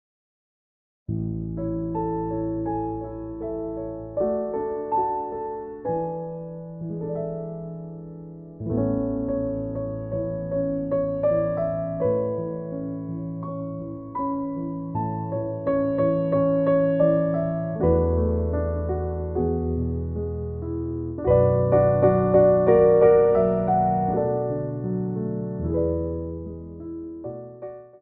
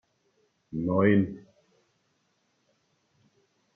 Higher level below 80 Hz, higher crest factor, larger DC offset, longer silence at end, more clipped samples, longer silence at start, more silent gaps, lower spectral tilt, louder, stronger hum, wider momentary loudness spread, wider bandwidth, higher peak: first, -40 dBFS vs -66 dBFS; about the same, 18 dB vs 22 dB; neither; second, 0.05 s vs 2.35 s; neither; first, 1.1 s vs 0.7 s; neither; about the same, -10.5 dB/octave vs -10 dB/octave; about the same, -24 LUFS vs -26 LUFS; neither; about the same, 15 LU vs 17 LU; about the same, 3.6 kHz vs 3.5 kHz; first, -6 dBFS vs -10 dBFS